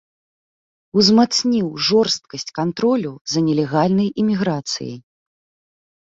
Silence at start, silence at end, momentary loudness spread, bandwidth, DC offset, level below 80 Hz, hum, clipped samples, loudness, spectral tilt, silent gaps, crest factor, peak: 0.95 s; 1.1 s; 11 LU; 7.8 kHz; under 0.1%; -58 dBFS; none; under 0.1%; -18 LUFS; -5 dB/octave; 3.21-3.25 s; 18 dB; -2 dBFS